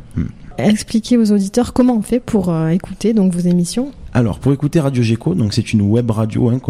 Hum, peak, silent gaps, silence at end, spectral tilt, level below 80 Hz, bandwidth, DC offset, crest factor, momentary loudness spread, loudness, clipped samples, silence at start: none; -2 dBFS; none; 0 s; -7 dB/octave; -38 dBFS; 14 kHz; under 0.1%; 12 dB; 5 LU; -16 LUFS; under 0.1%; 0 s